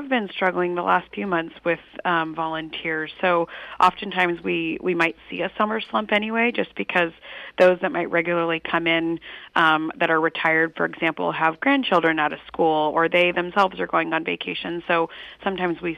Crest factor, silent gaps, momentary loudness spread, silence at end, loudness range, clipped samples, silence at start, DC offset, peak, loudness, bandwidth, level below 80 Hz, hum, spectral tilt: 18 dB; none; 8 LU; 0 s; 3 LU; under 0.1%; 0 s; under 0.1%; -6 dBFS; -22 LUFS; 10 kHz; -60 dBFS; none; -6 dB/octave